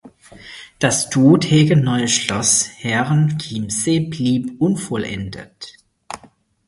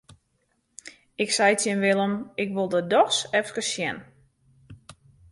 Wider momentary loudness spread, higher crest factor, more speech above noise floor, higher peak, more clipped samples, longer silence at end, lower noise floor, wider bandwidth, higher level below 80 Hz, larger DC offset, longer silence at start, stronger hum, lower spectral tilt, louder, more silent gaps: about the same, 22 LU vs 21 LU; about the same, 18 dB vs 20 dB; second, 34 dB vs 48 dB; first, 0 dBFS vs -6 dBFS; neither; about the same, 0.5 s vs 0.4 s; second, -51 dBFS vs -71 dBFS; about the same, 11.5 kHz vs 11.5 kHz; first, -50 dBFS vs -66 dBFS; neither; second, 0.05 s vs 0.85 s; neither; first, -4.5 dB/octave vs -3 dB/octave; first, -17 LUFS vs -24 LUFS; neither